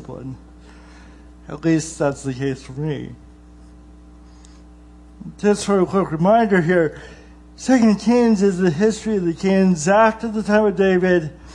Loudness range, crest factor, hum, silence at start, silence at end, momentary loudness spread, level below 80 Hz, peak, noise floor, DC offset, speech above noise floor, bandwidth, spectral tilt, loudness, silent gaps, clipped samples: 11 LU; 16 dB; none; 0 s; 0 s; 18 LU; -46 dBFS; -2 dBFS; -43 dBFS; under 0.1%; 26 dB; 11.5 kHz; -6.5 dB/octave; -18 LUFS; none; under 0.1%